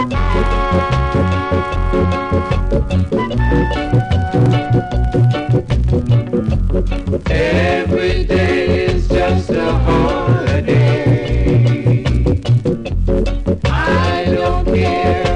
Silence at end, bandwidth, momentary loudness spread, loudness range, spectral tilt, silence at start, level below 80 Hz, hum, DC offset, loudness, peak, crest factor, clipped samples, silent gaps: 0 s; 9.8 kHz; 4 LU; 2 LU; -7.5 dB/octave; 0 s; -20 dBFS; none; under 0.1%; -15 LUFS; -2 dBFS; 12 dB; under 0.1%; none